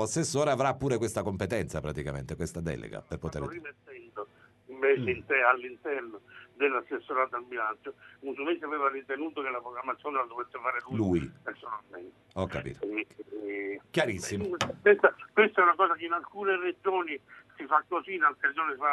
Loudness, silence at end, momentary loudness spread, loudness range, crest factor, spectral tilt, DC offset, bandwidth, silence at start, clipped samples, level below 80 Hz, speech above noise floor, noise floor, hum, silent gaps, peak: -30 LUFS; 0 s; 17 LU; 8 LU; 24 dB; -5 dB/octave; under 0.1%; 12 kHz; 0 s; under 0.1%; -56 dBFS; 22 dB; -52 dBFS; none; none; -6 dBFS